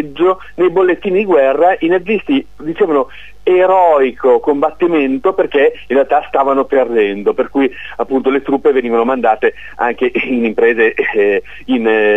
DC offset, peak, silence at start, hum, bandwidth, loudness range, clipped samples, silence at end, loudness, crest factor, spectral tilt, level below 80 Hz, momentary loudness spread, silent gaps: 2%; 0 dBFS; 0 s; none; 7.6 kHz; 2 LU; under 0.1%; 0 s; -13 LUFS; 12 dB; -7 dB/octave; -46 dBFS; 6 LU; none